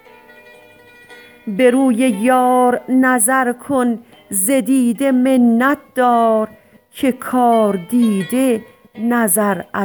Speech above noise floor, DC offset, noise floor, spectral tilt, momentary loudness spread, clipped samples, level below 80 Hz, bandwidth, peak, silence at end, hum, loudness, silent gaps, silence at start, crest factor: 30 dB; under 0.1%; -44 dBFS; -4.5 dB/octave; 8 LU; under 0.1%; -62 dBFS; over 20 kHz; -2 dBFS; 0 s; none; -15 LUFS; none; 1.1 s; 14 dB